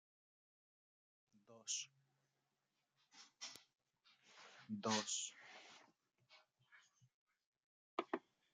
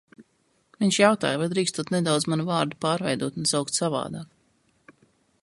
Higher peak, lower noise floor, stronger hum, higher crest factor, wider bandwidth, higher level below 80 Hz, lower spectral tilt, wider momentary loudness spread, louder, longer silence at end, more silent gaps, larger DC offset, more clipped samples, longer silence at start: second, -26 dBFS vs -6 dBFS; first, -89 dBFS vs -68 dBFS; neither; first, 26 dB vs 20 dB; about the same, 10.5 kHz vs 11.5 kHz; second, under -90 dBFS vs -66 dBFS; second, -2 dB/octave vs -4 dB/octave; first, 24 LU vs 8 LU; second, -46 LUFS vs -24 LUFS; second, 0.35 s vs 1.2 s; first, 7.14-7.26 s, 7.46-7.97 s vs none; neither; neither; first, 1.5 s vs 0.2 s